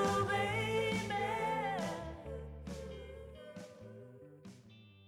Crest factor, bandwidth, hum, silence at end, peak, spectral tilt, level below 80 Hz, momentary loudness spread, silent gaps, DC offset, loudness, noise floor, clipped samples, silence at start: 16 dB; 17.5 kHz; none; 0 s; -24 dBFS; -5 dB/octave; -56 dBFS; 21 LU; none; under 0.1%; -37 LUFS; -59 dBFS; under 0.1%; 0 s